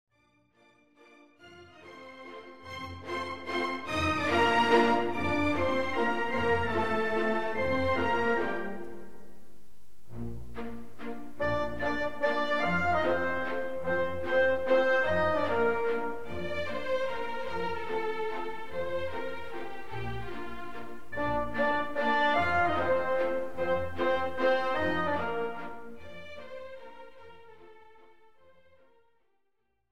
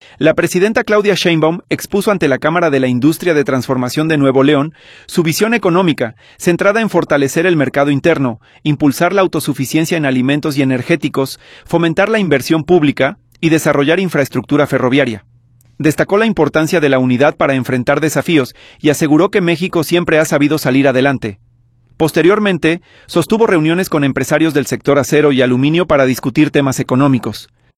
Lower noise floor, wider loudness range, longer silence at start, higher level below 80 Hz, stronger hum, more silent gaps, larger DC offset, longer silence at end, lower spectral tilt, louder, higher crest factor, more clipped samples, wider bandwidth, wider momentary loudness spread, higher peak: first, -79 dBFS vs -50 dBFS; first, 11 LU vs 2 LU; second, 0.05 s vs 0.2 s; second, -54 dBFS vs -48 dBFS; neither; neither; first, 2% vs under 0.1%; second, 0 s vs 0.35 s; about the same, -5.5 dB/octave vs -5.5 dB/octave; second, -30 LUFS vs -13 LUFS; first, 20 dB vs 12 dB; neither; about the same, 15.5 kHz vs 16 kHz; first, 18 LU vs 6 LU; second, -12 dBFS vs 0 dBFS